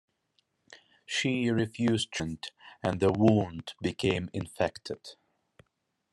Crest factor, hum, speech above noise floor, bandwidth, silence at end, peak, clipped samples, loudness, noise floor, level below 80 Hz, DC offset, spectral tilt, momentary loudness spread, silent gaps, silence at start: 22 dB; none; 49 dB; 12 kHz; 1 s; -8 dBFS; under 0.1%; -30 LUFS; -78 dBFS; -62 dBFS; under 0.1%; -5.5 dB/octave; 16 LU; none; 0.7 s